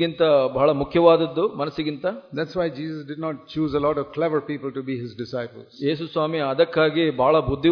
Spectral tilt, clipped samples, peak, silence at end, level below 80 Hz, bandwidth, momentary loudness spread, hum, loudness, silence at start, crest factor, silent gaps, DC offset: -8 dB/octave; under 0.1%; -2 dBFS; 0 s; -50 dBFS; 5.4 kHz; 12 LU; none; -22 LUFS; 0 s; 20 dB; none; under 0.1%